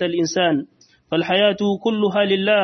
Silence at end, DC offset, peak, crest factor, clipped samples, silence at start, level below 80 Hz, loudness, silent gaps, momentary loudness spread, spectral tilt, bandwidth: 0 s; under 0.1%; -4 dBFS; 14 dB; under 0.1%; 0 s; -64 dBFS; -19 LUFS; none; 7 LU; -5 dB/octave; 6.4 kHz